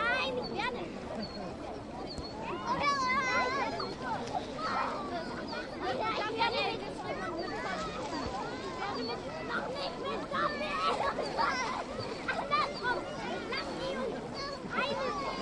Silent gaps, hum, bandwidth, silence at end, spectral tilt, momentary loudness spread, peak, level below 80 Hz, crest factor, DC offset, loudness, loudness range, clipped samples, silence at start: none; none; 11.5 kHz; 0 s; -4 dB/octave; 9 LU; -18 dBFS; -56 dBFS; 18 dB; under 0.1%; -34 LUFS; 3 LU; under 0.1%; 0 s